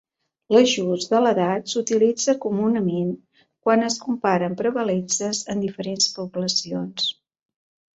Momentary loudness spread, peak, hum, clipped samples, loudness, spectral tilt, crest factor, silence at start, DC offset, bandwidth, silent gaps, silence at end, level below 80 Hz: 8 LU; -4 dBFS; none; under 0.1%; -22 LUFS; -4 dB/octave; 20 dB; 0.5 s; under 0.1%; 8.2 kHz; none; 0.85 s; -66 dBFS